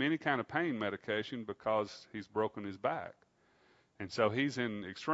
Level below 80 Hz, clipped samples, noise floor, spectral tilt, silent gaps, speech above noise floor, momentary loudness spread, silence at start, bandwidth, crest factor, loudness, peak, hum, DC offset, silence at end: -76 dBFS; under 0.1%; -69 dBFS; -3.5 dB/octave; none; 33 dB; 10 LU; 0 s; 7.6 kHz; 22 dB; -36 LUFS; -14 dBFS; none; under 0.1%; 0 s